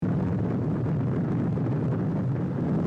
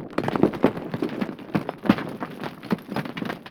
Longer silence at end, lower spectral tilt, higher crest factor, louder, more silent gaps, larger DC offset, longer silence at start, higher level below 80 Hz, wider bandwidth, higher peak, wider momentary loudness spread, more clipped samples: about the same, 0 s vs 0 s; first, -11 dB/octave vs -7.5 dB/octave; second, 10 dB vs 24 dB; about the same, -27 LUFS vs -27 LUFS; neither; neither; about the same, 0 s vs 0 s; about the same, -52 dBFS vs -56 dBFS; second, 5.8 kHz vs 18 kHz; second, -16 dBFS vs -2 dBFS; second, 1 LU vs 11 LU; neither